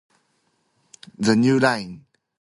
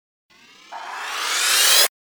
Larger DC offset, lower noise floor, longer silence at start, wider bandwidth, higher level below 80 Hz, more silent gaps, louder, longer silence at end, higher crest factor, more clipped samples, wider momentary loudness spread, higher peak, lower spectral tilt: neither; first, -68 dBFS vs -40 dBFS; first, 1.2 s vs 0.7 s; second, 11.5 kHz vs over 20 kHz; first, -62 dBFS vs -68 dBFS; neither; second, -20 LUFS vs -16 LUFS; first, 0.45 s vs 0.3 s; about the same, 18 dB vs 20 dB; neither; second, 12 LU vs 20 LU; about the same, -4 dBFS vs -2 dBFS; first, -5.5 dB/octave vs 4 dB/octave